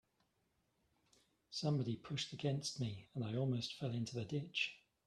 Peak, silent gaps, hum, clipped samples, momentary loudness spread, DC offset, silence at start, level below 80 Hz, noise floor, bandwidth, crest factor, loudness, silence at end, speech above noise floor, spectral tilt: -24 dBFS; none; none; under 0.1%; 5 LU; under 0.1%; 1.5 s; -76 dBFS; -82 dBFS; 12 kHz; 20 dB; -42 LUFS; 0.3 s; 41 dB; -5 dB/octave